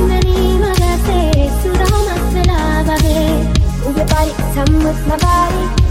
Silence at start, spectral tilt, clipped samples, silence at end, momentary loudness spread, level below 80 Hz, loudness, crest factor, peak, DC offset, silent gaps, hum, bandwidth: 0 s; -6 dB/octave; under 0.1%; 0 s; 2 LU; -16 dBFS; -14 LUFS; 12 dB; 0 dBFS; under 0.1%; none; none; 16.5 kHz